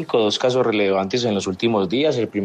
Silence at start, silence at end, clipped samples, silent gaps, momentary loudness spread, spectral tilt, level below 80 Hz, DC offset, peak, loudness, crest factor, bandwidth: 0 s; 0 s; under 0.1%; none; 3 LU; -5 dB/octave; -66 dBFS; under 0.1%; -6 dBFS; -19 LUFS; 12 dB; 9.6 kHz